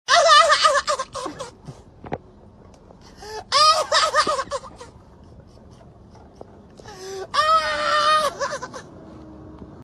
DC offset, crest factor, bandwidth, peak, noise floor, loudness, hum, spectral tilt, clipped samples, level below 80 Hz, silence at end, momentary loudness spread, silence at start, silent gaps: under 0.1%; 22 dB; 13 kHz; -2 dBFS; -47 dBFS; -18 LUFS; none; -1 dB/octave; under 0.1%; -52 dBFS; 0 s; 24 LU; 0.1 s; none